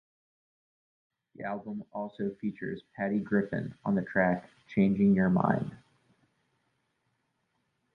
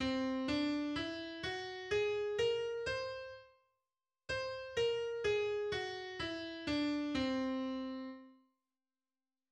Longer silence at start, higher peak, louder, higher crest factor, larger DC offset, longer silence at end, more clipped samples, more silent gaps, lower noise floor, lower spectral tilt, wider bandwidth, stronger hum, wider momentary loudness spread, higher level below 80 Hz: first, 1.4 s vs 0 s; first, -10 dBFS vs -24 dBFS; first, -30 LUFS vs -38 LUFS; first, 22 dB vs 14 dB; neither; first, 2.2 s vs 1.2 s; neither; neither; second, -78 dBFS vs under -90 dBFS; first, -10 dB/octave vs -4.5 dB/octave; second, 4.2 kHz vs 10 kHz; neither; first, 14 LU vs 9 LU; about the same, -64 dBFS vs -64 dBFS